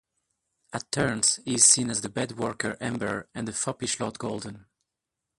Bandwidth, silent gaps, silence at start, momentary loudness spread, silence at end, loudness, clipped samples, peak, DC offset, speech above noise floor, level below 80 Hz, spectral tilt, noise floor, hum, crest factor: 11.5 kHz; none; 0.7 s; 16 LU; 0.8 s; -25 LUFS; under 0.1%; -2 dBFS; under 0.1%; 58 dB; -60 dBFS; -2.5 dB/octave; -86 dBFS; none; 26 dB